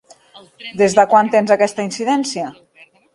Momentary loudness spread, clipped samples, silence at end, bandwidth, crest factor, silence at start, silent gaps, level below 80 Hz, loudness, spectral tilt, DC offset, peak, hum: 17 LU; under 0.1%; 0.65 s; 11.5 kHz; 16 dB; 0.35 s; none; -62 dBFS; -15 LUFS; -4.5 dB/octave; under 0.1%; 0 dBFS; none